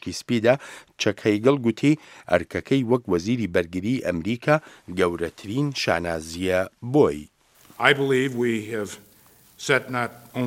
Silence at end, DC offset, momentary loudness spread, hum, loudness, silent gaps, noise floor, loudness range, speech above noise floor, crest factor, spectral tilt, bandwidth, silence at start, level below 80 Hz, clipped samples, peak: 0 s; under 0.1%; 9 LU; none; -23 LUFS; none; -55 dBFS; 2 LU; 31 dB; 24 dB; -5.5 dB/octave; 16.5 kHz; 0.05 s; -54 dBFS; under 0.1%; 0 dBFS